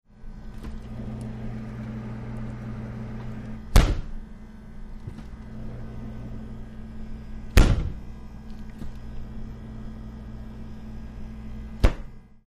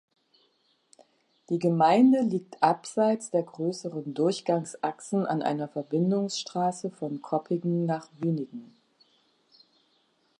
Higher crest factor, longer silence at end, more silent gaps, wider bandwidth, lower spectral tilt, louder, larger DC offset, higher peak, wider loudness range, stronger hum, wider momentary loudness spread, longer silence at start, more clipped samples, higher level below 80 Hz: about the same, 22 dB vs 20 dB; second, 0.1 s vs 1.75 s; neither; first, 14.5 kHz vs 11 kHz; about the same, -6 dB/octave vs -6.5 dB/octave; second, -32 LUFS vs -27 LUFS; neither; about the same, -6 dBFS vs -8 dBFS; first, 11 LU vs 7 LU; neither; first, 19 LU vs 12 LU; second, 0.15 s vs 1.5 s; neither; first, -30 dBFS vs -80 dBFS